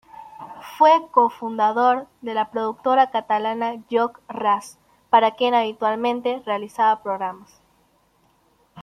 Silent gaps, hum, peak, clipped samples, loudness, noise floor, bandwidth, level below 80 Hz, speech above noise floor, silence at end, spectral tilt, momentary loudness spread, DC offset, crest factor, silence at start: none; none; -2 dBFS; under 0.1%; -21 LUFS; -62 dBFS; 15 kHz; -70 dBFS; 41 dB; 0 s; -4.5 dB/octave; 10 LU; under 0.1%; 20 dB; 0.2 s